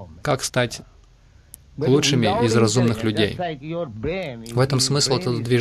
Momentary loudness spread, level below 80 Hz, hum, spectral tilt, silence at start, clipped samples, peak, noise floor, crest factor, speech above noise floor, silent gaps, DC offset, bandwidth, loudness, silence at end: 11 LU; -48 dBFS; none; -4.5 dB/octave; 0 s; under 0.1%; -6 dBFS; -51 dBFS; 16 dB; 31 dB; none; under 0.1%; 14 kHz; -21 LUFS; 0 s